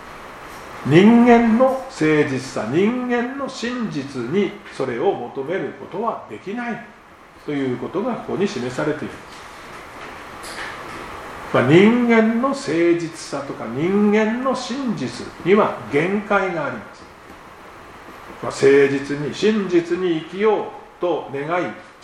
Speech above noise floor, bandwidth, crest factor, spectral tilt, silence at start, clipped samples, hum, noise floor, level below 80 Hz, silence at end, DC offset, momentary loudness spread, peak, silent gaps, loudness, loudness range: 26 dB; 12.5 kHz; 20 dB; -6.5 dB/octave; 0 s; under 0.1%; none; -45 dBFS; -52 dBFS; 0.1 s; under 0.1%; 21 LU; 0 dBFS; none; -19 LUFS; 9 LU